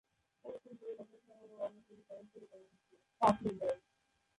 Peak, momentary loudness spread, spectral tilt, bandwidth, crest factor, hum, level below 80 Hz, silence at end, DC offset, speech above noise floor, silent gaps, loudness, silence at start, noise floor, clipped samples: -16 dBFS; 26 LU; -6.5 dB/octave; 11 kHz; 24 dB; none; -72 dBFS; 0.6 s; under 0.1%; 43 dB; none; -38 LUFS; 0.45 s; -79 dBFS; under 0.1%